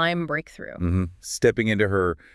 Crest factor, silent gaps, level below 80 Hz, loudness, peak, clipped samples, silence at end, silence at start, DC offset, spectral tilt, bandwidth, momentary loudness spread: 18 dB; none; -48 dBFS; -24 LUFS; -6 dBFS; under 0.1%; 0.2 s; 0 s; under 0.1%; -5.5 dB/octave; 12 kHz; 9 LU